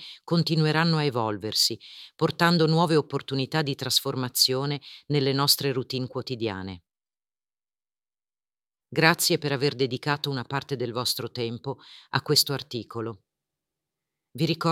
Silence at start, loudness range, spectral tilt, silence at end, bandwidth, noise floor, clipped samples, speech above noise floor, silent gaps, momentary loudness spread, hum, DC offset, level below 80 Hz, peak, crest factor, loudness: 0 s; 5 LU; -4 dB/octave; 0 s; 17 kHz; under -90 dBFS; under 0.1%; over 64 dB; none; 13 LU; none; under 0.1%; -68 dBFS; -2 dBFS; 24 dB; -25 LUFS